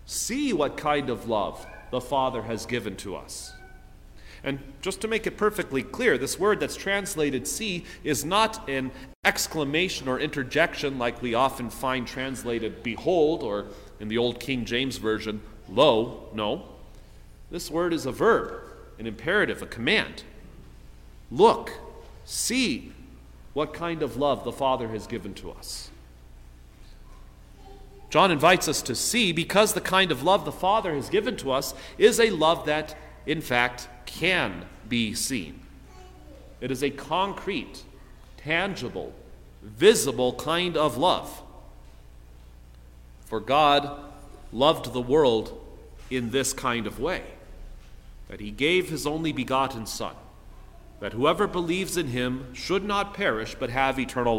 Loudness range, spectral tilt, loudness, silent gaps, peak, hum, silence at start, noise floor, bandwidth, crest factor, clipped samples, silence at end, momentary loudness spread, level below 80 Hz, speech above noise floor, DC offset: 7 LU; -3.5 dB/octave; -25 LUFS; 9.15-9.23 s; -4 dBFS; none; 0.05 s; -48 dBFS; 16.5 kHz; 22 dB; under 0.1%; 0 s; 16 LU; -48 dBFS; 22 dB; under 0.1%